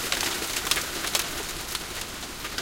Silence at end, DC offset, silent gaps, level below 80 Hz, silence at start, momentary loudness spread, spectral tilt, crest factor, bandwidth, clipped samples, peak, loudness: 0 s; under 0.1%; none; -46 dBFS; 0 s; 8 LU; -0.5 dB/octave; 26 dB; 17 kHz; under 0.1%; -4 dBFS; -28 LUFS